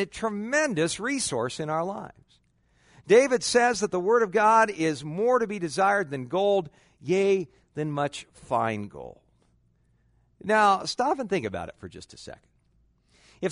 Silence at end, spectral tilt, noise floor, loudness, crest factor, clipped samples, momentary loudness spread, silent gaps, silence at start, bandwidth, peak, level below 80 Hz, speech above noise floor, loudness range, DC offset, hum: 0 s; -4 dB/octave; -66 dBFS; -25 LUFS; 20 dB; under 0.1%; 20 LU; none; 0 s; 11 kHz; -8 dBFS; -62 dBFS; 40 dB; 7 LU; under 0.1%; none